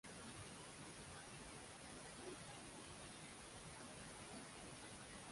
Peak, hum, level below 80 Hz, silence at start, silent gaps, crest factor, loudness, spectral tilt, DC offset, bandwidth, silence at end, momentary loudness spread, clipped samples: -42 dBFS; none; -70 dBFS; 0.05 s; none; 14 dB; -55 LUFS; -3 dB/octave; under 0.1%; 11.5 kHz; 0 s; 1 LU; under 0.1%